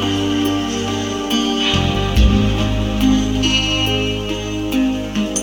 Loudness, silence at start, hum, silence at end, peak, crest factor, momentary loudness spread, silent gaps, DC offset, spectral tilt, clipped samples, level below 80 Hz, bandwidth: -17 LUFS; 0 s; none; 0 s; -2 dBFS; 14 dB; 6 LU; none; under 0.1%; -4.5 dB/octave; under 0.1%; -24 dBFS; 19.5 kHz